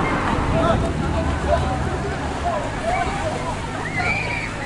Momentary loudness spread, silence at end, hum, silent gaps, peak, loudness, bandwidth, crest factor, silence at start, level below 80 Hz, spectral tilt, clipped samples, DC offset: 5 LU; 0 s; none; none; -6 dBFS; -22 LUFS; 11.5 kHz; 16 dB; 0 s; -30 dBFS; -6 dB/octave; under 0.1%; under 0.1%